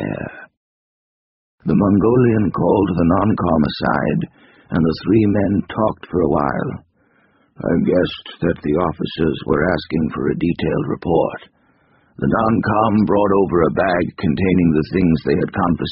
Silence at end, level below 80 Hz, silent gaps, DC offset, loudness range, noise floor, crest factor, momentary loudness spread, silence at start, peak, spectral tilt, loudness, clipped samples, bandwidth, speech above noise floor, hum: 0 s; -40 dBFS; 0.57-1.58 s; under 0.1%; 4 LU; -58 dBFS; 16 dB; 8 LU; 0 s; -2 dBFS; -6.5 dB/octave; -18 LUFS; under 0.1%; 5.6 kHz; 41 dB; none